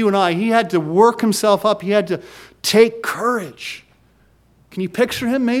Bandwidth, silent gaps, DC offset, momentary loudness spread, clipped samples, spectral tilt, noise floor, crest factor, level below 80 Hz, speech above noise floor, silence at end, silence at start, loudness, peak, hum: 16.5 kHz; none; under 0.1%; 14 LU; under 0.1%; -4.5 dB/octave; -55 dBFS; 18 dB; -58 dBFS; 38 dB; 0 s; 0 s; -17 LUFS; 0 dBFS; none